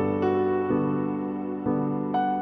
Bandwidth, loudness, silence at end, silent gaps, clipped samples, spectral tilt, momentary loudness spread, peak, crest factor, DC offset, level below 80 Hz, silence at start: 4.9 kHz; -26 LUFS; 0 s; none; under 0.1%; -10.5 dB/octave; 6 LU; -14 dBFS; 12 dB; under 0.1%; -60 dBFS; 0 s